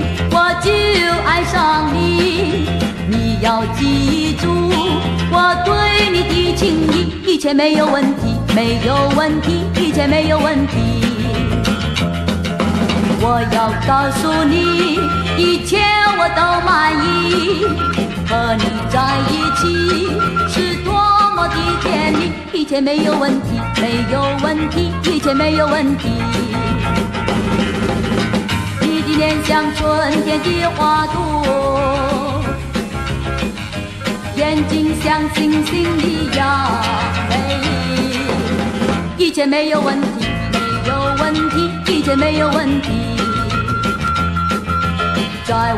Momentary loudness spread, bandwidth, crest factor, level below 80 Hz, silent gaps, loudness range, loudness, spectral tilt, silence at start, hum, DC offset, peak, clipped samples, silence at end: 5 LU; 14 kHz; 14 dB; -30 dBFS; none; 3 LU; -15 LUFS; -5.5 dB/octave; 0 s; none; under 0.1%; 0 dBFS; under 0.1%; 0 s